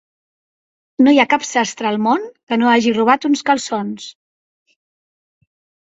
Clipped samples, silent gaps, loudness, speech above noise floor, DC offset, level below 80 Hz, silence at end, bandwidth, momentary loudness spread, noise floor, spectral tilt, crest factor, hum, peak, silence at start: under 0.1%; 2.43-2.47 s; -16 LUFS; over 75 dB; under 0.1%; -64 dBFS; 1.75 s; 8 kHz; 13 LU; under -90 dBFS; -4 dB/octave; 18 dB; none; 0 dBFS; 1 s